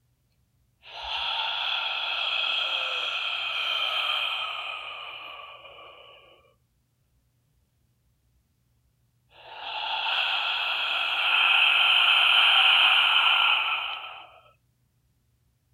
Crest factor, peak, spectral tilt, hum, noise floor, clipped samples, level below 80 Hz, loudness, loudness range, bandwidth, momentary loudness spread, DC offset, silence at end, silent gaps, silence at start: 20 dB; -8 dBFS; 1 dB/octave; none; -70 dBFS; under 0.1%; -70 dBFS; -22 LUFS; 16 LU; 15.5 kHz; 19 LU; under 0.1%; 1.45 s; none; 0.85 s